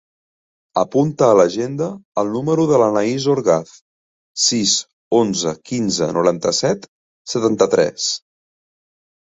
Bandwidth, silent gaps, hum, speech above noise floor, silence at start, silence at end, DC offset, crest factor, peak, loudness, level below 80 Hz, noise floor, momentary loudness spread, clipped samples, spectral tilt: 8.2 kHz; 2.05-2.12 s, 3.81-4.34 s, 4.93-5.11 s, 6.88-7.25 s; none; over 73 dB; 0.75 s; 1.15 s; under 0.1%; 18 dB; -2 dBFS; -17 LUFS; -58 dBFS; under -90 dBFS; 9 LU; under 0.1%; -4 dB/octave